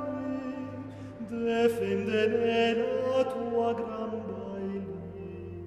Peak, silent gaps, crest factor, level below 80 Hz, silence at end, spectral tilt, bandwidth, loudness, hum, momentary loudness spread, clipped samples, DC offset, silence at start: -14 dBFS; none; 18 dB; -62 dBFS; 0 s; -6.5 dB/octave; 14 kHz; -30 LUFS; none; 15 LU; under 0.1%; under 0.1%; 0 s